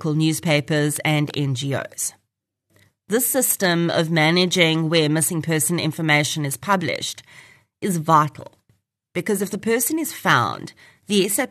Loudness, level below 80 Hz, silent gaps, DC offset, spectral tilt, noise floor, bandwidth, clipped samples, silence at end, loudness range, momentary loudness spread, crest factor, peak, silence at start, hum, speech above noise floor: -20 LUFS; -66 dBFS; none; under 0.1%; -4 dB/octave; -77 dBFS; 13.5 kHz; under 0.1%; 0.05 s; 5 LU; 9 LU; 20 dB; -2 dBFS; 0 s; none; 57 dB